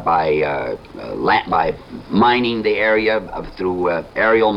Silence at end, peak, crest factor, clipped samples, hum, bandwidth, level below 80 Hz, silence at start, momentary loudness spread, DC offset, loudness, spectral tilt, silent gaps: 0 s; -2 dBFS; 16 dB; under 0.1%; none; 6.2 kHz; -42 dBFS; 0 s; 12 LU; under 0.1%; -18 LUFS; -7 dB/octave; none